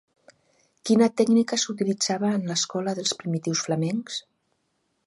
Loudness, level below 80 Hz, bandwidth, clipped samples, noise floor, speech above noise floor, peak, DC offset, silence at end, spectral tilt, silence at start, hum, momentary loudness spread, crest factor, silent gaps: -24 LUFS; -72 dBFS; 11.5 kHz; under 0.1%; -73 dBFS; 49 dB; -8 dBFS; under 0.1%; 0.85 s; -4.5 dB/octave; 0.85 s; none; 9 LU; 18 dB; none